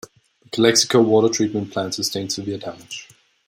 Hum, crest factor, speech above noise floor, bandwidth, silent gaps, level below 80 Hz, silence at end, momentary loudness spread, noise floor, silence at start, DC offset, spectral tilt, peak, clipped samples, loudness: none; 18 dB; 26 dB; 16 kHz; none; -64 dBFS; 0.45 s; 17 LU; -45 dBFS; 0.55 s; under 0.1%; -3.5 dB/octave; -2 dBFS; under 0.1%; -19 LUFS